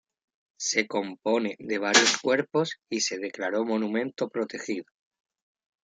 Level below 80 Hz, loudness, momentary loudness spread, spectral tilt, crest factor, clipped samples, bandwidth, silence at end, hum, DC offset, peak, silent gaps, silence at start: -78 dBFS; -26 LUFS; 12 LU; -2 dB/octave; 26 dB; under 0.1%; 10 kHz; 1.05 s; none; under 0.1%; -4 dBFS; none; 0.6 s